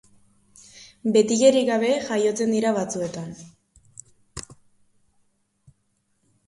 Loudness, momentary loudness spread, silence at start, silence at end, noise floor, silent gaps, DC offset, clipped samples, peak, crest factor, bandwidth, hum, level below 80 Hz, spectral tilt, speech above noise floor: -21 LUFS; 22 LU; 0.8 s; 1.95 s; -70 dBFS; none; under 0.1%; under 0.1%; -4 dBFS; 20 dB; 11.5 kHz; none; -60 dBFS; -4.5 dB/octave; 49 dB